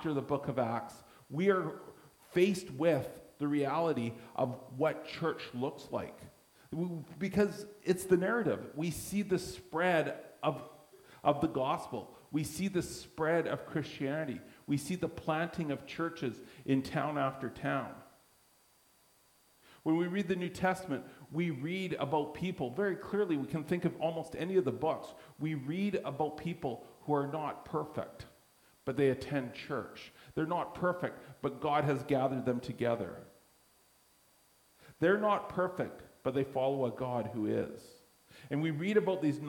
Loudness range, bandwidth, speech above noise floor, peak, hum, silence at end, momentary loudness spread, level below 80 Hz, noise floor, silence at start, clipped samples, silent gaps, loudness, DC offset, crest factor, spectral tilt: 4 LU; 19 kHz; 33 dB; -14 dBFS; none; 0 s; 11 LU; -66 dBFS; -68 dBFS; 0 s; under 0.1%; none; -35 LUFS; under 0.1%; 20 dB; -6.5 dB/octave